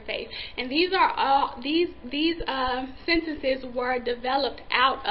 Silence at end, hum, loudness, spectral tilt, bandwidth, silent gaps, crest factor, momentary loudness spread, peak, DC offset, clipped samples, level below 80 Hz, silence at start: 0 s; none; -25 LUFS; -8 dB/octave; 5.6 kHz; none; 20 dB; 7 LU; -6 dBFS; 0.4%; under 0.1%; -46 dBFS; 0 s